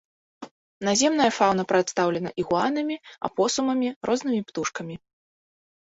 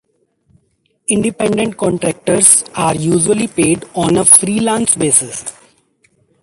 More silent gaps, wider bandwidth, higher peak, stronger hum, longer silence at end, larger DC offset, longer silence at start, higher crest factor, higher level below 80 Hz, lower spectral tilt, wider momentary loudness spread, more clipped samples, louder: first, 0.51-0.81 s, 3.96-4.01 s vs none; second, 8.2 kHz vs 16 kHz; second, -6 dBFS vs 0 dBFS; neither; about the same, 1 s vs 0.9 s; neither; second, 0.4 s vs 1.1 s; first, 20 dB vs 14 dB; second, -64 dBFS vs -48 dBFS; about the same, -4 dB/octave vs -3.5 dB/octave; about the same, 11 LU vs 10 LU; second, under 0.1% vs 0.2%; second, -24 LUFS vs -12 LUFS